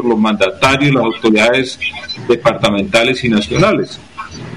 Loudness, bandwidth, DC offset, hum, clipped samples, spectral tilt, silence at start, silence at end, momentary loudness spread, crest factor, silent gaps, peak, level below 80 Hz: -13 LUFS; 14.5 kHz; 0.5%; none; under 0.1%; -5 dB/octave; 0 s; 0 s; 12 LU; 12 dB; none; -2 dBFS; -42 dBFS